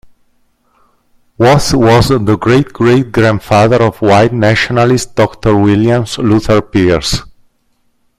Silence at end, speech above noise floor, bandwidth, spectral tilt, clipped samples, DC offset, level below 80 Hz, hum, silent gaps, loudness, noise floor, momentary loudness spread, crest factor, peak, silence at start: 0.9 s; 48 dB; 15 kHz; -6 dB/octave; under 0.1%; under 0.1%; -32 dBFS; none; none; -10 LUFS; -57 dBFS; 4 LU; 10 dB; 0 dBFS; 1.4 s